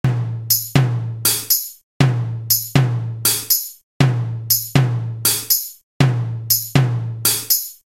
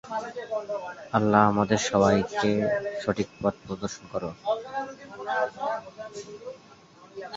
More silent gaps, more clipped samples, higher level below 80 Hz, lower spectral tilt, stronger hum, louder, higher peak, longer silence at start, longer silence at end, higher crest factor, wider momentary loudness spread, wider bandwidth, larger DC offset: first, 1.83-2.00 s, 3.83-4.00 s, 5.83-6.00 s vs none; neither; first, -48 dBFS vs -56 dBFS; second, -3.5 dB/octave vs -5.5 dB/octave; neither; first, -17 LUFS vs -27 LUFS; first, 0 dBFS vs -4 dBFS; about the same, 0.05 s vs 0.05 s; first, 0.25 s vs 0 s; second, 18 dB vs 24 dB; second, 6 LU vs 18 LU; first, 17 kHz vs 7.8 kHz; neither